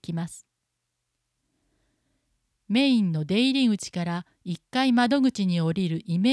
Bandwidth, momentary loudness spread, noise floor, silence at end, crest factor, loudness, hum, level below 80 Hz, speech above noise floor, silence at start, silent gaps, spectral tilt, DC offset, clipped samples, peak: 11 kHz; 12 LU; -80 dBFS; 0 s; 16 dB; -24 LUFS; none; -66 dBFS; 56 dB; 0.1 s; none; -6 dB/octave; under 0.1%; under 0.1%; -10 dBFS